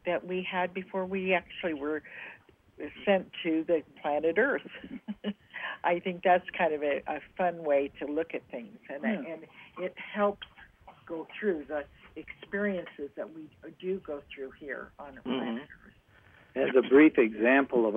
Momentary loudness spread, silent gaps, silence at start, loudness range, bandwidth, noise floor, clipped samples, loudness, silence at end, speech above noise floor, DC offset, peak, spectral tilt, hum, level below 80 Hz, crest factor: 19 LU; none; 0.05 s; 9 LU; 3.8 kHz; -59 dBFS; under 0.1%; -30 LUFS; 0 s; 29 dB; under 0.1%; -10 dBFS; -8 dB/octave; none; -66 dBFS; 22 dB